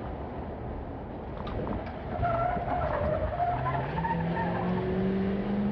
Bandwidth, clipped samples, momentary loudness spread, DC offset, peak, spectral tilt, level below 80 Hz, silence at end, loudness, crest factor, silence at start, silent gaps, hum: 5.6 kHz; under 0.1%; 9 LU; under 0.1%; -18 dBFS; -10 dB/octave; -42 dBFS; 0 s; -31 LUFS; 12 dB; 0 s; none; none